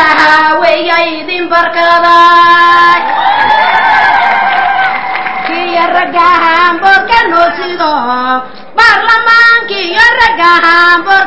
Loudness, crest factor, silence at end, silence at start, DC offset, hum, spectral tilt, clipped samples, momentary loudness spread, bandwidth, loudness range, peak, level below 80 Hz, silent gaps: -6 LUFS; 8 dB; 0 s; 0 s; 3%; none; -3 dB/octave; 3%; 8 LU; 8 kHz; 3 LU; 0 dBFS; -42 dBFS; none